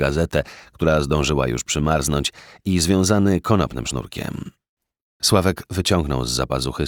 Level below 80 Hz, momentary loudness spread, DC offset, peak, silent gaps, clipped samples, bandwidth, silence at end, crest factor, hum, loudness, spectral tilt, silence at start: -34 dBFS; 12 LU; under 0.1%; -2 dBFS; 4.69-4.77 s, 5.01-5.20 s; under 0.1%; 19.5 kHz; 0 s; 18 dB; none; -20 LUFS; -5 dB/octave; 0 s